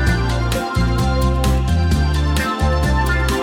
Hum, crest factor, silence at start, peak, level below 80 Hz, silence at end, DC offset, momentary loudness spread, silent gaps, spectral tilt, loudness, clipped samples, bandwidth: none; 12 dB; 0 s; -4 dBFS; -20 dBFS; 0 s; under 0.1%; 2 LU; none; -6 dB/octave; -18 LUFS; under 0.1%; 16 kHz